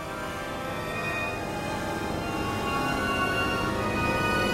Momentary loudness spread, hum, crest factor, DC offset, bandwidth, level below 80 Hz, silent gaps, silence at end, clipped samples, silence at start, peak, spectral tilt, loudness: 7 LU; none; 14 dB; under 0.1%; 16 kHz; -44 dBFS; none; 0 s; under 0.1%; 0 s; -14 dBFS; -4.5 dB/octave; -28 LUFS